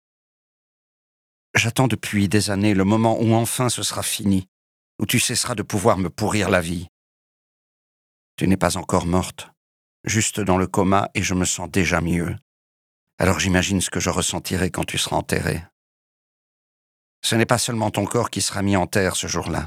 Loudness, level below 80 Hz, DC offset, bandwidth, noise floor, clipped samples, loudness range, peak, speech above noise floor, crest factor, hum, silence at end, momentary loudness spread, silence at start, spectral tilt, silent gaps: -21 LUFS; -46 dBFS; under 0.1%; 16.5 kHz; under -90 dBFS; under 0.1%; 4 LU; 0 dBFS; over 69 dB; 22 dB; none; 0 s; 6 LU; 1.55 s; -4.5 dB/octave; 4.48-4.99 s, 6.89-8.38 s, 9.57-10.04 s, 12.42-13.07 s, 13.13-13.18 s, 15.72-17.22 s